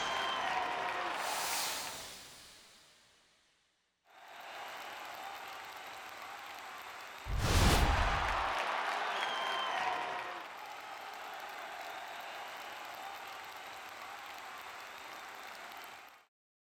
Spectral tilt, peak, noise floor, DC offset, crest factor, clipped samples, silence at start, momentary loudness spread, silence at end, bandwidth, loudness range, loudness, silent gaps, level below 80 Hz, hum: -3 dB/octave; -16 dBFS; -77 dBFS; under 0.1%; 24 dB; under 0.1%; 0 s; 14 LU; 0.4 s; over 20 kHz; 14 LU; -38 LUFS; none; -46 dBFS; none